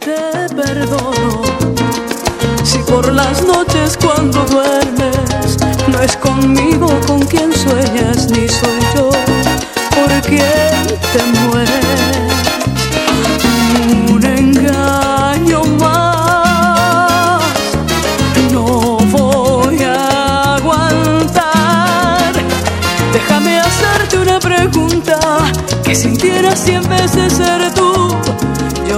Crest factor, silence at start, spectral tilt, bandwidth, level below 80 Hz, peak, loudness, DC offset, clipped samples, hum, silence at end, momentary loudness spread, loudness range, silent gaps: 12 dB; 0 s; -4.5 dB/octave; 17 kHz; -28 dBFS; 0 dBFS; -11 LUFS; under 0.1%; under 0.1%; none; 0 s; 4 LU; 1 LU; none